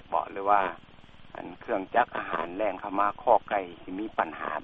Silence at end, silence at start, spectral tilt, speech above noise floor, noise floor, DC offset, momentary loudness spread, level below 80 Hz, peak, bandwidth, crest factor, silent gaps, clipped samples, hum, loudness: 0 s; 0.05 s; -7.5 dB/octave; 20 dB; -48 dBFS; under 0.1%; 16 LU; -60 dBFS; -8 dBFS; 4.7 kHz; 22 dB; none; under 0.1%; none; -28 LUFS